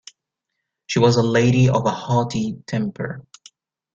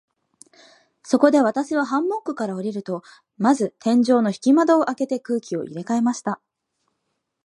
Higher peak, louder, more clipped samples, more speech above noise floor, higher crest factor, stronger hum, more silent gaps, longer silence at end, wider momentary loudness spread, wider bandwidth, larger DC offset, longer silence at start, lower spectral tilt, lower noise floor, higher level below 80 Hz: about the same, -4 dBFS vs -2 dBFS; about the same, -19 LUFS vs -21 LUFS; neither; first, 61 dB vs 56 dB; about the same, 18 dB vs 20 dB; neither; neither; second, 0.75 s vs 1.1 s; about the same, 13 LU vs 12 LU; second, 7.6 kHz vs 11.5 kHz; neither; second, 0.9 s vs 1.05 s; about the same, -6.5 dB/octave vs -5.5 dB/octave; first, -80 dBFS vs -76 dBFS; first, -52 dBFS vs -74 dBFS